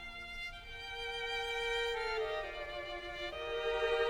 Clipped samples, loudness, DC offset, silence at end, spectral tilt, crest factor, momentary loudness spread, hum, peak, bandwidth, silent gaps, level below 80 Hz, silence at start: under 0.1%; -38 LUFS; under 0.1%; 0 s; -2.5 dB/octave; 16 dB; 9 LU; none; -22 dBFS; 16.5 kHz; none; -54 dBFS; 0 s